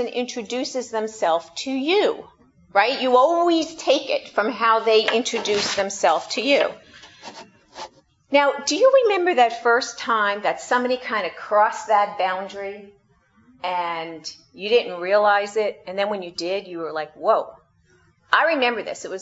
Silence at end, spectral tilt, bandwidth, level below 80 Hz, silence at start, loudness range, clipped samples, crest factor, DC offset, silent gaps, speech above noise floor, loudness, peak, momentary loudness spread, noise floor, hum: 0 s; -2.5 dB/octave; 8 kHz; -68 dBFS; 0 s; 4 LU; under 0.1%; 22 dB; under 0.1%; none; 38 dB; -21 LUFS; 0 dBFS; 15 LU; -59 dBFS; none